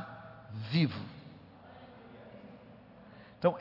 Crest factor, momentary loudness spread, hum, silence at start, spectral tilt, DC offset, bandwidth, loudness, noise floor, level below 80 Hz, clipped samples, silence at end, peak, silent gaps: 24 dB; 23 LU; none; 0 s; -6 dB/octave; under 0.1%; 5.8 kHz; -34 LUFS; -55 dBFS; -72 dBFS; under 0.1%; 0 s; -12 dBFS; none